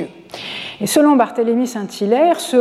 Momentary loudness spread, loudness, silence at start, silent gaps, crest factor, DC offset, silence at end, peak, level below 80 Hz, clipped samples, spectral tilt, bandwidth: 15 LU; -16 LUFS; 0 s; none; 14 dB; under 0.1%; 0 s; -2 dBFS; -66 dBFS; under 0.1%; -4.5 dB/octave; 15.5 kHz